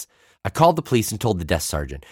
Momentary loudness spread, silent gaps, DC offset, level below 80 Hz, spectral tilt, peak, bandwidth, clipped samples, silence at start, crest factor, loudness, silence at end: 13 LU; none; under 0.1%; -38 dBFS; -5 dB/octave; -4 dBFS; 17.5 kHz; under 0.1%; 0 s; 18 dB; -21 LUFS; 0.1 s